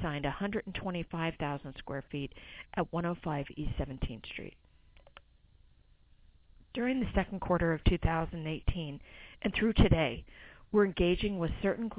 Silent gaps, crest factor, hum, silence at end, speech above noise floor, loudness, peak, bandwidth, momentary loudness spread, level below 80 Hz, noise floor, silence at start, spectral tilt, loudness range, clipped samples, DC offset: none; 22 dB; none; 0 s; 30 dB; -33 LUFS; -12 dBFS; 4 kHz; 15 LU; -42 dBFS; -63 dBFS; 0 s; -5.5 dB/octave; 10 LU; under 0.1%; under 0.1%